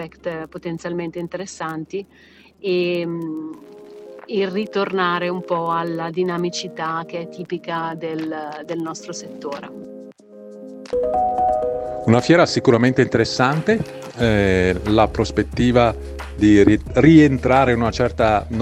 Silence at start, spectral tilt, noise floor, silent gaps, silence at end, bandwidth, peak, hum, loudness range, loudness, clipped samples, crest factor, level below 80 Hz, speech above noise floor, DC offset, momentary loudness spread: 0 s; -6.5 dB/octave; -40 dBFS; none; 0 s; 11 kHz; 0 dBFS; none; 12 LU; -19 LUFS; under 0.1%; 18 dB; -38 dBFS; 22 dB; under 0.1%; 16 LU